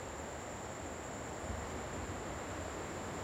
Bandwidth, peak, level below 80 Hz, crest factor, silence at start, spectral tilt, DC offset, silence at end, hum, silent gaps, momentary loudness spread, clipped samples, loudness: 16.5 kHz; -28 dBFS; -54 dBFS; 14 dB; 0 s; -4.5 dB/octave; under 0.1%; 0 s; none; none; 2 LU; under 0.1%; -43 LUFS